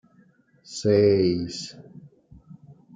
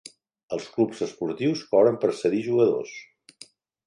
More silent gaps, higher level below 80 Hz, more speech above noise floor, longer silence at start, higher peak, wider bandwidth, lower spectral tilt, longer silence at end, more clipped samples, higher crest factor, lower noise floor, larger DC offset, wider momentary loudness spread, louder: neither; first, -62 dBFS vs -70 dBFS; first, 37 dB vs 28 dB; first, 0.7 s vs 0.5 s; about the same, -8 dBFS vs -6 dBFS; second, 9.4 kHz vs 11 kHz; about the same, -6.5 dB/octave vs -6.5 dB/octave; second, 0.45 s vs 0.85 s; neither; about the same, 18 dB vs 18 dB; first, -59 dBFS vs -52 dBFS; neither; first, 20 LU vs 13 LU; about the same, -22 LUFS vs -24 LUFS